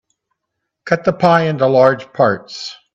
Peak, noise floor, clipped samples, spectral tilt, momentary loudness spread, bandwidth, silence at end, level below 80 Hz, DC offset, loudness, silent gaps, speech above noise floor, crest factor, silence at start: 0 dBFS; -76 dBFS; under 0.1%; -6.5 dB/octave; 16 LU; 7.8 kHz; 0.2 s; -56 dBFS; under 0.1%; -14 LUFS; none; 62 dB; 16 dB; 0.85 s